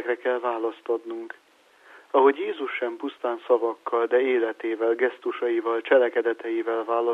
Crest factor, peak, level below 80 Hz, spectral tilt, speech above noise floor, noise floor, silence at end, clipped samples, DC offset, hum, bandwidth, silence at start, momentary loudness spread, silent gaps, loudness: 20 dB; -6 dBFS; -82 dBFS; -4.5 dB/octave; 29 dB; -53 dBFS; 0 s; under 0.1%; under 0.1%; none; 5 kHz; 0 s; 10 LU; none; -25 LUFS